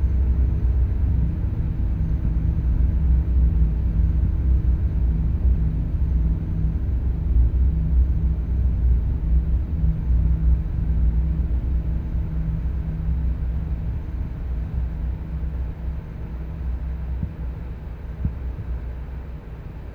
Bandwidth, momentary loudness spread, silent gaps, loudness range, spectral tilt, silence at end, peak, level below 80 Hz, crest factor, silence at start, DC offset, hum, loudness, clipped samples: 2.7 kHz; 10 LU; none; 9 LU; -11 dB/octave; 0 s; -8 dBFS; -22 dBFS; 14 dB; 0 s; under 0.1%; none; -24 LUFS; under 0.1%